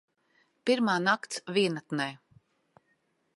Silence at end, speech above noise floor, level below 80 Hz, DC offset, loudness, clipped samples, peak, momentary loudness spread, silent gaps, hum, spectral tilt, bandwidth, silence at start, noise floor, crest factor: 1.2 s; 45 dB; -80 dBFS; under 0.1%; -29 LUFS; under 0.1%; -12 dBFS; 8 LU; none; none; -4.5 dB/octave; 11.5 kHz; 0.65 s; -74 dBFS; 20 dB